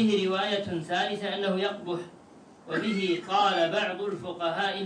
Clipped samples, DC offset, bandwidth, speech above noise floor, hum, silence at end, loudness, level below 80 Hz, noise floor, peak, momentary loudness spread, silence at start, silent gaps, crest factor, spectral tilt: under 0.1%; under 0.1%; 10 kHz; 24 dB; none; 0 s; -28 LUFS; -74 dBFS; -52 dBFS; -12 dBFS; 9 LU; 0 s; none; 16 dB; -5 dB/octave